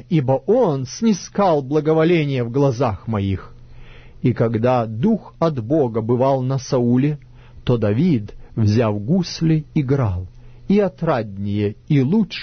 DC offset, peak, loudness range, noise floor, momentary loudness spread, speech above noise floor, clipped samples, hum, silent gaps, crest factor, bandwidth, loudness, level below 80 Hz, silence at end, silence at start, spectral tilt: under 0.1%; -6 dBFS; 2 LU; -39 dBFS; 6 LU; 21 dB; under 0.1%; none; none; 12 dB; 6.6 kHz; -19 LUFS; -44 dBFS; 0 s; 0.1 s; -7.5 dB/octave